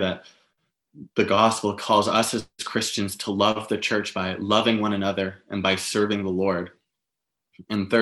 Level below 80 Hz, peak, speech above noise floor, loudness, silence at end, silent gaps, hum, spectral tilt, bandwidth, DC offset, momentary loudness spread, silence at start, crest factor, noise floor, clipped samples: -64 dBFS; -4 dBFS; 61 dB; -24 LUFS; 0 s; none; none; -4 dB/octave; 13 kHz; under 0.1%; 10 LU; 0 s; 20 dB; -85 dBFS; under 0.1%